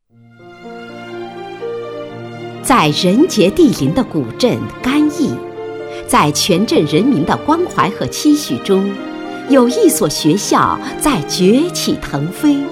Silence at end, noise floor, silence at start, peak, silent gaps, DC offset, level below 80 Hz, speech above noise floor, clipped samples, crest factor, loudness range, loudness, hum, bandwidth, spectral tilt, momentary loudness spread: 0 s; -42 dBFS; 0.4 s; 0 dBFS; none; under 0.1%; -42 dBFS; 29 dB; under 0.1%; 14 dB; 2 LU; -14 LUFS; none; 16.5 kHz; -4.5 dB/octave; 16 LU